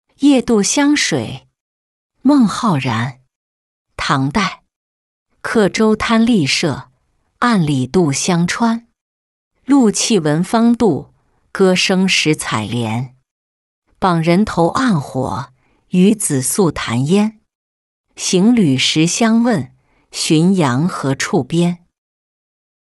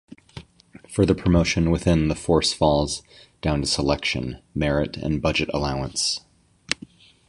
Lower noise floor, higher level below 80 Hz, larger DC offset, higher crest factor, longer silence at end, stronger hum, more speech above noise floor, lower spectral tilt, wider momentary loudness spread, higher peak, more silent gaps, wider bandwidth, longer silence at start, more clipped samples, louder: first, -62 dBFS vs -49 dBFS; second, -48 dBFS vs -36 dBFS; neither; second, 14 dB vs 22 dB; first, 1.1 s vs 0.55 s; neither; first, 48 dB vs 27 dB; about the same, -4.5 dB/octave vs -5 dB/octave; about the same, 10 LU vs 10 LU; about the same, -2 dBFS vs -2 dBFS; first, 1.60-2.10 s, 3.35-3.85 s, 4.76-5.26 s, 9.01-9.51 s, 13.31-13.82 s, 17.55-18.04 s vs none; about the same, 12 kHz vs 11.5 kHz; second, 0.2 s vs 0.35 s; neither; first, -15 LUFS vs -23 LUFS